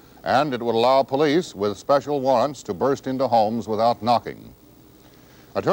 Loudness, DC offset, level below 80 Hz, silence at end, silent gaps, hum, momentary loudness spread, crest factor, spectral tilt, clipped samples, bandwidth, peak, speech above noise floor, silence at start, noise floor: -21 LUFS; under 0.1%; -58 dBFS; 0 s; none; none; 8 LU; 14 dB; -5.5 dB/octave; under 0.1%; 17 kHz; -8 dBFS; 29 dB; 0.25 s; -49 dBFS